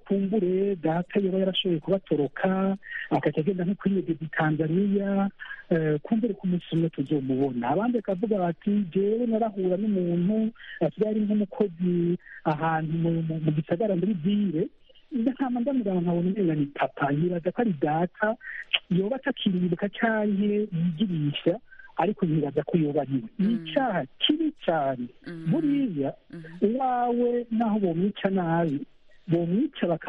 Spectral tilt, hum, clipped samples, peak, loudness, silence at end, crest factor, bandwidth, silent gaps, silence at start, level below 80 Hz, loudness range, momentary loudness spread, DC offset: -9.5 dB/octave; none; under 0.1%; -6 dBFS; -26 LUFS; 0 s; 20 dB; 4.4 kHz; none; 0.05 s; -62 dBFS; 1 LU; 4 LU; under 0.1%